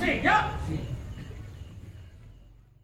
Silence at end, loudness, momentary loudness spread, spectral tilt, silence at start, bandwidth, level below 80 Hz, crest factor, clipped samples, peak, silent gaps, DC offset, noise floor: 0.3 s; -27 LUFS; 24 LU; -5.5 dB/octave; 0 s; 16 kHz; -42 dBFS; 20 dB; under 0.1%; -10 dBFS; none; under 0.1%; -53 dBFS